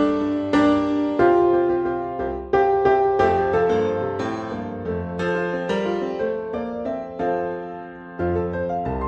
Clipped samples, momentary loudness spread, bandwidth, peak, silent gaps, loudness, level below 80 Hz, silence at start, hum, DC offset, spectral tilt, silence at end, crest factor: under 0.1%; 11 LU; 8.2 kHz; -4 dBFS; none; -22 LUFS; -46 dBFS; 0 s; none; under 0.1%; -7.5 dB/octave; 0 s; 16 dB